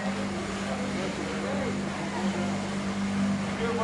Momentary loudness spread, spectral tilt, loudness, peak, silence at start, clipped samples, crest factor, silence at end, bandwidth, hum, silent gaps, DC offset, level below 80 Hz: 3 LU; -5.5 dB/octave; -30 LUFS; -18 dBFS; 0 s; under 0.1%; 12 dB; 0 s; 11.5 kHz; 50 Hz at -45 dBFS; none; under 0.1%; -52 dBFS